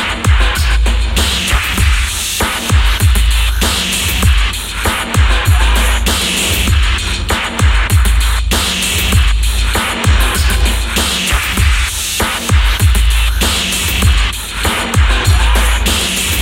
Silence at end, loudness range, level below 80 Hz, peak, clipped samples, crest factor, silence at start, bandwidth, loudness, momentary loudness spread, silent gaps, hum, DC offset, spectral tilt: 0 s; 0 LU; -14 dBFS; 0 dBFS; under 0.1%; 12 dB; 0 s; 17 kHz; -13 LUFS; 3 LU; none; none; under 0.1%; -3 dB/octave